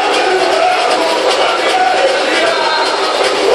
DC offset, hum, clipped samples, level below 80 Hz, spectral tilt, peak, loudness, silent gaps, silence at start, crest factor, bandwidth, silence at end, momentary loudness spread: under 0.1%; none; under 0.1%; -54 dBFS; -1 dB/octave; 0 dBFS; -12 LUFS; none; 0 s; 12 dB; 13.5 kHz; 0 s; 1 LU